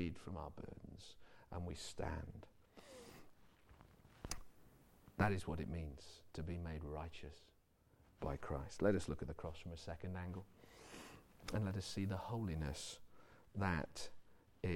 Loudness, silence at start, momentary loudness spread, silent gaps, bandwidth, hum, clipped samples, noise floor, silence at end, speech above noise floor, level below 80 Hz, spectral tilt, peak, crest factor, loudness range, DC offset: -46 LUFS; 0 s; 20 LU; none; 16.5 kHz; none; under 0.1%; -73 dBFS; 0 s; 29 dB; -58 dBFS; -6 dB/octave; -24 dBFS; 22 dB; 8 LU; under 0.1%